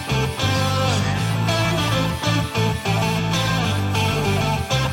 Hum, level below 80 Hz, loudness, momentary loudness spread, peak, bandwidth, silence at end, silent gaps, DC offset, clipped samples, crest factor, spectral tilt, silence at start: none; -38 dBFS; -20 LUFS; 2 LU; -6 dBFS; 17 kHz; 0 s; none; under 0.1%; under 0.1%; 14 dB; -5 dB/octave; 0 s